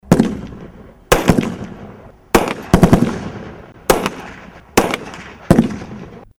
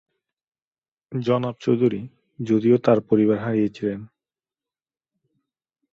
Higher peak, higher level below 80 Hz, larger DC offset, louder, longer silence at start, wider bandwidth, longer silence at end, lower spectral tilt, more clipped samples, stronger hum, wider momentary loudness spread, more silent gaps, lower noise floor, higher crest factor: about the same, 0 dBFS vs -2 dBFS; first, -30 dBFS vs -62 dBFS; neither; first, -16 LUFS vs -21 LUFS; second, 0.05 s vs 1.1 s; first, 18 kHz vs 7.4 kHz; second, 0.15 s vs 1.85 s; second, -5.5 dB/octave vs -9 dB/octave; neither; neither; first, 21 LU vs 15 LU; neither; second, -38 dBFS vs under -90 dBFS; about the same, 18 dB vs 22 dB